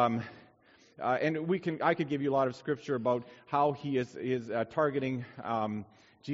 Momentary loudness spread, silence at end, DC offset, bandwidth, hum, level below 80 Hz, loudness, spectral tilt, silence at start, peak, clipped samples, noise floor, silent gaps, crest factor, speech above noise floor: 7 LU; 0 s; under 0.1%; 7.6 kHz; none; -72 dBFS; -32 LUFS; -5.5 dB/octave; 0 s; -12 dBFS; under 0.1%; -63 dBFS; none; 20 dB; 31 dB